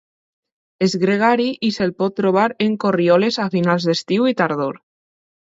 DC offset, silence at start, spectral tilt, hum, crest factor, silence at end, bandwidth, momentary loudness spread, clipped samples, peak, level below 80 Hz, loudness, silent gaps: under 0.1%; 0.8 s; -6 dB/octave; none; 18 dB; 0.7 s; 7.8 kHz; 5 LU; under 0.1%; -2 dBFS; -62 dBFS; -18 LUFS; none